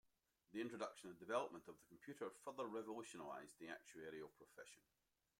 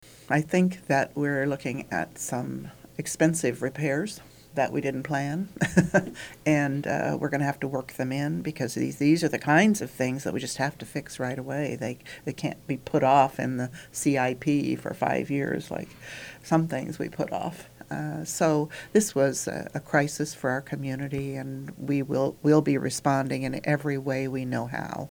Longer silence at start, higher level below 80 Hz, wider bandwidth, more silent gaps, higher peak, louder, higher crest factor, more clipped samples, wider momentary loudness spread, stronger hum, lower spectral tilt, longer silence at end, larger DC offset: first, 0.5 s vs 0.05 s; second, under -90 dBFS vs -60 dBFS; second, 16.5 kHz vs over 20 kHz; neither; second, -30 dBFS vs -6 dBFS; second, -52 LUFS vs -27 LUFS; about the same, 24 dB vs 22 dB; neither; first, 16 LU vs 12 LU; neither; second, -4 dB/octave vs -5.5 dB/octave; first, 0.6 s vs 0.05 s; neither